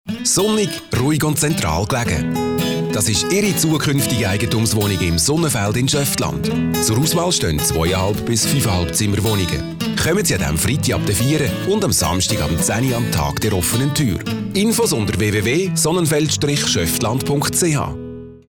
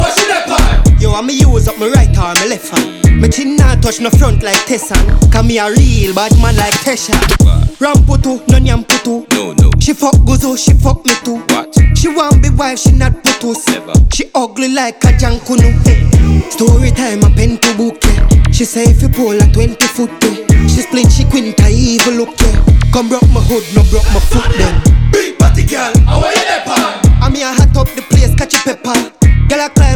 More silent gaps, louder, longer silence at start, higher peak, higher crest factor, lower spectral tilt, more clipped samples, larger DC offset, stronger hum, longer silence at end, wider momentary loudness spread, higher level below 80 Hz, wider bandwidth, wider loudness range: neither; second, -17 LUFS vs -10 LUFS; about the same, 0.05 s vs 0 s; second, -8 dBFS vs 0 dBFS; about the same, 10 dB vs 8 dB; about the same, -4 dB/octave vs -5 dB/octave; second, under 0.1% vs 0.3%; neither; neither; first, 0.15 s vs 0 s; about the same, 4 LU vs 4 LU; second, -36 dBFS vs -12 dBFS; about the same, over 20 kHz vs 19 kHz; about the same, 1 LU vs 1 LU